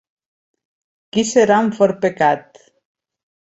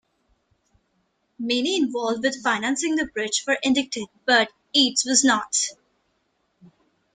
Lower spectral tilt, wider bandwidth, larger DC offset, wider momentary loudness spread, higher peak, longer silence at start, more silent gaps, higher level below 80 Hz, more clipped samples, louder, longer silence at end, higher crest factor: first, -4.5 dB/octave vs -1 dB/octave; second, 8 kHz vs 9.8 kHz; neither; about the same, 9 LU vs 7 LU; about the same, -2 dBFS vs -4 dBFS; second, 1.15 s vs 1.4 s; neither; about the same, -60 dBFS vs -64 dBFS; neither; first, -16 LUFS vs -22 LUFS; second, 1.05 s vs 1.4 s; about the same, 18 dB vs 22 dB